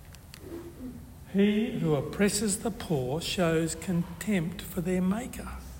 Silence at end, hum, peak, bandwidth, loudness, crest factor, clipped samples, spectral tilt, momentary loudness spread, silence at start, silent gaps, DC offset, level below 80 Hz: 0 s; none; -14 dBFS; 16.5 kHz; -29 LUFS; 16 dB; under 0.1%; -5 dB/octave; 17 LU; 0 s; none; under 0.1%; -50 dBFS